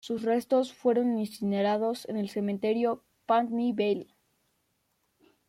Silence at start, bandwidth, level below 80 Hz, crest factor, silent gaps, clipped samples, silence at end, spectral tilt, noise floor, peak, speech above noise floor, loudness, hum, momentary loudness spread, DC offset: 0.05 s; 16 kHz; -74 dBFS; 16 dB; none; under 0.1%; 1.45 s; -6.5 dB/octave; -75 dBFS; -14 dBFS; 47 dB; -29 LUFS; none; 6 LU; under 0.1%